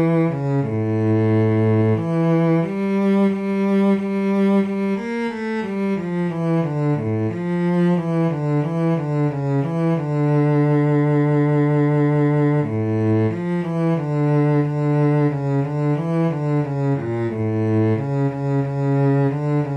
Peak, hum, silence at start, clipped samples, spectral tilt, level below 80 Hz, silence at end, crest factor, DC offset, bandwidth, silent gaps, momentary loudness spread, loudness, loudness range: -8 dBFS; none; 0 s; under 0.1%; -10 dB/octave; -58 dBFS; 0 s; 10 dB; under 0.1%; 7.6 kHz; none; 5 LU; -20 LUFS; 3 LU